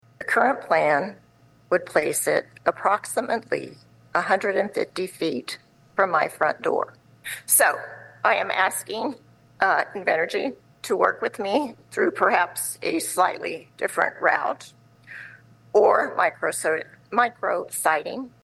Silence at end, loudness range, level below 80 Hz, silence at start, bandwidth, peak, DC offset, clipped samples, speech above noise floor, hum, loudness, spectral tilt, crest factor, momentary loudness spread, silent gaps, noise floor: 0.15 s; 3 LU; -70 dBFS; 0.2 s; 13 kHz; -4 dBFS; under 0.1%; under 0.1%; 25 dB; none; -23 LUFS; -2.5 dB/octave; 20 dB; 13 LU; none; -48 dBFS